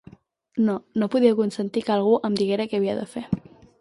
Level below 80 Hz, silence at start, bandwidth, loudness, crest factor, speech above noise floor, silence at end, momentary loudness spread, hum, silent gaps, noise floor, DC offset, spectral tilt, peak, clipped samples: -58 dBFS; 0.55 s; 11.5 kHz; -23 LUFS; 18 dB; 28 dB; 0.4 s; 11 LU; none; none; -50 dBFS; under 0.1%; -7 dB/octave; -6 dBFS; under 0.1%